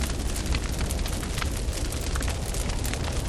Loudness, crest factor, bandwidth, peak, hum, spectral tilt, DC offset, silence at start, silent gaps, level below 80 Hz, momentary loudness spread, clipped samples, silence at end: -29 LUFS; 16 dB; 16.5 kHz; -12 dBFS; none; -4 dB/octave; under 0.1%; 0 s; none; -30 dBFS; 1 LU; under 0.1%; 0 s